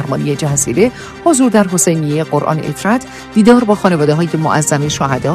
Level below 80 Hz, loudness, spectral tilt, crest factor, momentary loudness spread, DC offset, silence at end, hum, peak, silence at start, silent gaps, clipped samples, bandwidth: -44 dBFS; -13 LUFS; -5 dB/octave; 12 dB; 7 LU; under 0.1%; 0 s; none; 0 dBFS; 0 s; none; 0.2%; 14 kHz